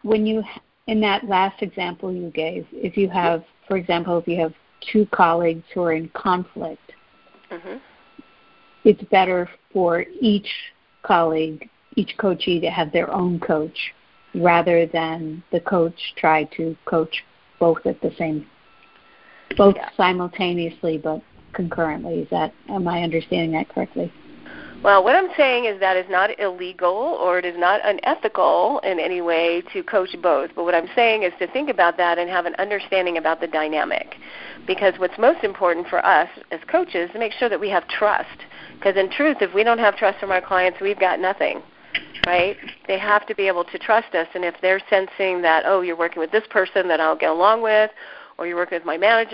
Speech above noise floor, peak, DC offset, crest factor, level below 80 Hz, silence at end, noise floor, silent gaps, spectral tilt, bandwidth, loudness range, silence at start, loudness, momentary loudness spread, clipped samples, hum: 34 dB; 0 dBFS; under 0.1%; 20 dB; -56 dBFS; 0 s; -54 dBFS; none; -8.5 dB/octave; 5.6 kHz; 4 LU; 0.05 s; -20 LUFS; 11 LU; under 0.1%; none